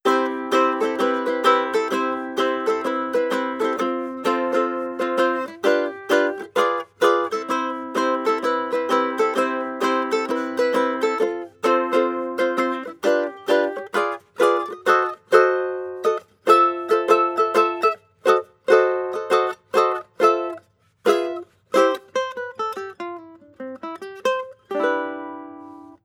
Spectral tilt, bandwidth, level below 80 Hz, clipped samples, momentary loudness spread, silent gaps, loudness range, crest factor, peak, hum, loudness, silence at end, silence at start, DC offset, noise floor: -3.5 dB/octave; 17.5 kHz; -78 dBFS; under 0.1%; 10 LU; none; 6 LU; 20 dB; -2 dBFS; none; -21 LUFS; 0.1 s; 0.05 s; under 0.1%; -48 dBFS